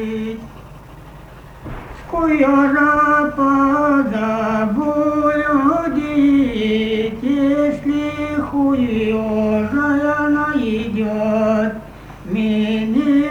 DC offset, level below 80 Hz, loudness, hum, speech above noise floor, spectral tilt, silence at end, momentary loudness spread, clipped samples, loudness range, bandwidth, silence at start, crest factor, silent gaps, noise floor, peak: under 0.1%; -40 dBFS; -17 LUFS; none; 22 dB; -7 dB/octave; 0 s; 12 LU; under 0.1%; 3 LU; 7.4 kHz; 0 s; 14 dB; none; -38 dBFS; -2 dBFS